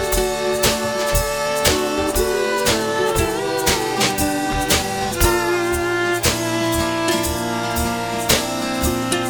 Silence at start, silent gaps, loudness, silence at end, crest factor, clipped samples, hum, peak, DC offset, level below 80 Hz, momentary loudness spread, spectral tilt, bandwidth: 0 s; none; -19 LUFS; 0 s; 20 dB; under 0.1%; none; 0 dBFS; 0.2%; -32 dBFS; 4 LU; -3.5 dB/octave; 19.5 kHz